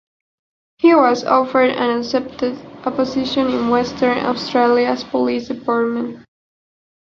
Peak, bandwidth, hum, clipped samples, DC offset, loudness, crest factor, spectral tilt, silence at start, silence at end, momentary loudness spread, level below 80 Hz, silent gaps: 0 dBFS; 7.2 kHz; none; under 0.1%; under 0.1%; -17 LUFS; 16 dB; -5 dB/octave; 0.8 s; 0.8 s; 10 LU; -54 dBFS; none